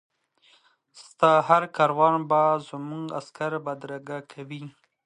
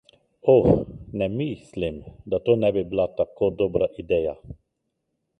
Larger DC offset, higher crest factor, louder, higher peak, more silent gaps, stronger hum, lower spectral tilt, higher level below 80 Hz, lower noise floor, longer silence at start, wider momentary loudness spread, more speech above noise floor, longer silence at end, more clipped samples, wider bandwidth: neither; about the same, 22 dB vs 20 dB; about the same, -23 LUFS vs -24 LUFS; about the same, -4 dBFS vs -4 dBFS; neither; neither; second, -6 dB/octave vs -9 dB/octave; second, -76 dBFS vs -46 dBFS; second, -62 dBFS vs -77 dBFS; first, 0.95 s vs 0.45 s; first, 18 LU vs 12 LU; second, 38 dB vs 55 dB; second, 0.35 s vs 0.85 s; neither; first, 10 kHz vs 8.4 kHz